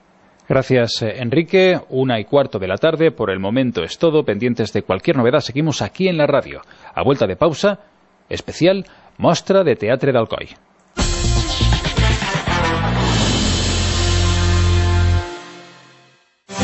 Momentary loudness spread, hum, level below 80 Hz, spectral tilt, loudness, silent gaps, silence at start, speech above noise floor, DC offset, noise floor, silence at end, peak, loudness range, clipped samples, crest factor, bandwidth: 9 LU; none; -28 dBFS; -5.5 dB/octave; -17 LUFS; none; 0.5 s; 37 dB; under 0.1%; -53 dBFS; 0 s; -2 dBFS; 2 LU; under 0.1%; 16 dB; 8.4 kHz